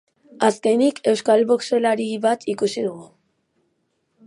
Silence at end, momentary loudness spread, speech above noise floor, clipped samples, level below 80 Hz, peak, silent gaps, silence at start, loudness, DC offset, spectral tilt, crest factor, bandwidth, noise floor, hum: 1.2 s; 7 LU; 51 dB; under 0.1%; -72 dBFS; -2 dBFS; none; 0.4 s; -20 LUFS; under 0.1%; -4.5 dB/octave; 20 dB; 11.5 kHz; -70 dBFS; none